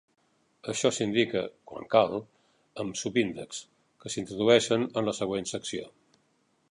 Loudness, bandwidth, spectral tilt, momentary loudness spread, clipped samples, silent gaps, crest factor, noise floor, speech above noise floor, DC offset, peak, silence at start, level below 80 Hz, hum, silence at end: -28 LUFS; 11 kHz; -4 dB/octave; 18 LU; under 0.1%; none; 24 dB; -70 dBFS; 42 dB; under 0.1%; -6 dBFS; 0.65 s; -66 dBFS; none; 0.85 s